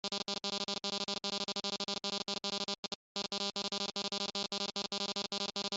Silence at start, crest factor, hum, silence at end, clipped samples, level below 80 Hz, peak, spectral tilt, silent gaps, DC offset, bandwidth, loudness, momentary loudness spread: 0.05 s; 18 dB; none; 0 s; under 0.1%; -76 dBFS; -20 dBFS; -2 dB/octave; 2.78-2.83 s, 2.95-3.15 s; under 0.1%; 8.2 kHz; -36 LUFS; 1 LU